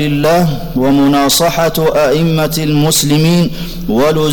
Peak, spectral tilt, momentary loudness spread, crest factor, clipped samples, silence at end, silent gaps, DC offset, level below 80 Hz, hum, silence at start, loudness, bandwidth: -4 dBFS; -5 dB/octave; 5 LU; 8 dB; under 0.1%; 0 s; none; under 0.1%; -30 dBFS; none; 0 s; -11 LUFS; over 20 kHz